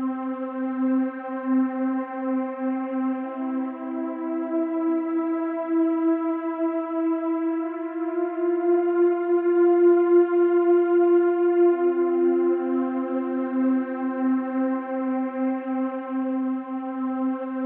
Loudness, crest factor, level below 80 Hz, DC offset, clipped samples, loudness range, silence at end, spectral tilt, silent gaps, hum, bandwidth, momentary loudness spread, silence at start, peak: -24 LUFS; 14 dB; under -90 dBFS; under 0.1%; under 0.1%; 7 LU; 0 s; -5.5 dB/octave; none; none; 3.3 kHz; 10 LU; 0 s; -10 dBFS